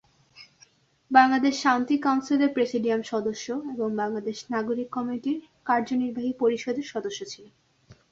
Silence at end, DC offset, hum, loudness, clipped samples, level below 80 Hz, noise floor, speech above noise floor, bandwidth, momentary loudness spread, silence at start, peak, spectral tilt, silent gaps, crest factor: 0.2 s; under 0.1%; none; -26 LUFS; under 0.1%; -70 dBFS; -60 dBFS; 34 dB; 7.8 kHz; 11 LU; 0.35 s; -4 dBFS; -4.5 dB/octave; none; 22 dB